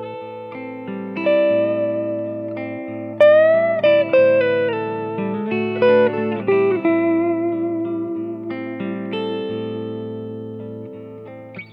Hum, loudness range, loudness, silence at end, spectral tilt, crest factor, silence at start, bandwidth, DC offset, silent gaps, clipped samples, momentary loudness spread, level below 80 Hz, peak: none; 10 LU; -19 LUFS; 0 s; -8.5 dB/octave; 16 dB; 0 s; 5.2 kHz; under 0.1%; none; under 0.1%; 17 LU; -72 dBFS; -4 dBFS